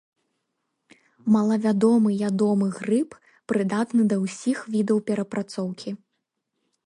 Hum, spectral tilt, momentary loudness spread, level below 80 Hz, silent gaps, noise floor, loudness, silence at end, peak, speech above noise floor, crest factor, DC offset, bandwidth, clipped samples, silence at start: none; -7 dB/octave; 11 LU; -70 dBFS; none; -79 dBFS; -23 LUFS; 0.9 s; -8 dBFS; 56 dB; 16 dB; under 0.1%; 11 kHz; under 0.1%; 1.25 s